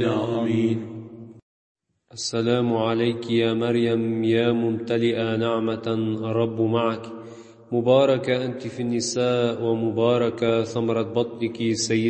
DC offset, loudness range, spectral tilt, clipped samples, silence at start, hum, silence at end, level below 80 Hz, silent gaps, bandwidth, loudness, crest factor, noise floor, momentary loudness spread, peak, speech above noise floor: under 0.1%; 3 LU; -5.5 dB/octave; under 0.1%; 0 s; none; 0 s; -64 dBFS; 1.42-1.75 s; 8.8 kHz; -23 LUFS; 18 dB; -43 dBFS; 9 LU; -6 dBFS; 20 dB